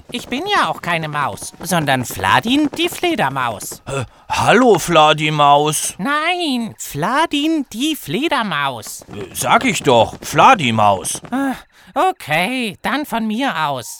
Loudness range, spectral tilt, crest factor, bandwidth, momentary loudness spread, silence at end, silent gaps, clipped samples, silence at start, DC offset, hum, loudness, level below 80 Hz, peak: 4 LU; -4 dB/octave; 16 dB; over 20 kHz; 12 LU; 0 s; none; under 0.1%; 0.1 s; under 0.1%; none; -16 LUFS; -48 dBFS; 0 dBFS